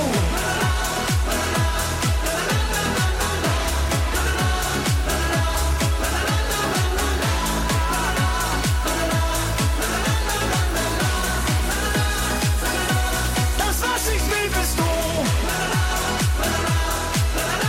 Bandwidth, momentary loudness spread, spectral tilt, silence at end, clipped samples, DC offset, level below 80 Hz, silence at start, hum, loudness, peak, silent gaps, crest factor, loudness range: 16.5 kHz; 1 LU; -4 dB/octave; 0 s; under 0.1%; under 0.1%; -26 dBFS; 0 s; none; -21 LUFS; -8 dBFS; none; 12 dB; 0 LU